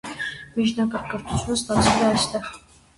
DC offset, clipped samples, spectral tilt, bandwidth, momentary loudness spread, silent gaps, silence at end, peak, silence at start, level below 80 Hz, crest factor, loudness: under 0.1%; under 0.1%; -4 dB/octave; 11.5 kHz; 12 LU; none; 0.4 s; -4 dBFS; 0.05 s; -42 dBFS; 20 dB; -23 LUFS